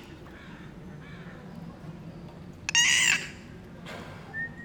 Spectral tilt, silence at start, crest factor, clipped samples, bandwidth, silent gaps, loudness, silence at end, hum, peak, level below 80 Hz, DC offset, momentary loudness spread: -0.5 dB/octave; 0 s; 24 dB; under 0.1%; over 20 kHz; none; -24 LUFS; 0 s; none; -8 dBFS; -56 dBFS; under 0.1%; 25 LU